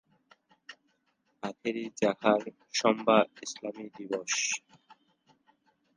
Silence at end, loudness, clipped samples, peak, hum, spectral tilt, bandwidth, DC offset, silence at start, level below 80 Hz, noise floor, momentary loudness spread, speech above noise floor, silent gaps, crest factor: 1.05 s; -30 LUFS; under 0.1%; -10 dBFS; none; -3 dB/octave; 10.5 kHz; under 0.1%; 0.7 s; -78 dBFS; -75 dBFS; 17 LU; 45 dB; none; 24 dB